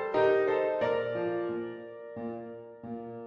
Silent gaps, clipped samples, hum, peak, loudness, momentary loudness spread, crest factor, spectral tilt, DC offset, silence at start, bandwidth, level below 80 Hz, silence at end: none; under 0.1%; none; -14 dBFS; -30 LUFS; 17 LU; 16 dB; -7.5 dB/octave; under 0.1%; 0 s; 6.6 kHz; -70 dBFS; 0 s